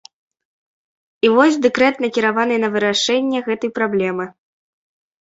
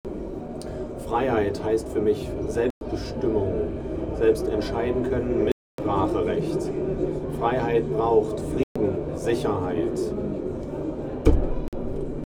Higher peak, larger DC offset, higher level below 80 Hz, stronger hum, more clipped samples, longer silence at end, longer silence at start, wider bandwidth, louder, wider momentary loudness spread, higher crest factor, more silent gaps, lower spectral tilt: about the same, -2 dBFS vs -2 dBFS; neither; second, -62 dBFS vs -34 dBFS; neither; neither; first, 0.9 s vs 0 s; first, 1.25 s vs 0.05 s; second, 8 kHz vs 15 kHz; first, -17 LUFS vs -26 LUFS; about the same, 9 LU vs 9 LU; about the same, 18 dB vs 22 dB; second, none vs 2.70-2.81 s, 5.52-5.78 s, 8.63-8.75 s, 11.68-11.72 s; second, -4 dB/octave vs -7.5 dB/octave